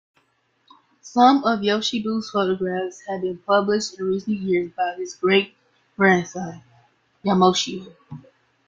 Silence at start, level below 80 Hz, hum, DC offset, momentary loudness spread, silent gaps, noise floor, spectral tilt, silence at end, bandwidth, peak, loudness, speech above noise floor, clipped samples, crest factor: 1.05 s; -64 dBFS; none; under 0.1%; 16 LU; none; -66 dBFS; -5 dB/octave; 0.5 s; 7.6 kHz; -2 dBFS; -21 LUFS; 45 dB; under 0.1%; 20 dB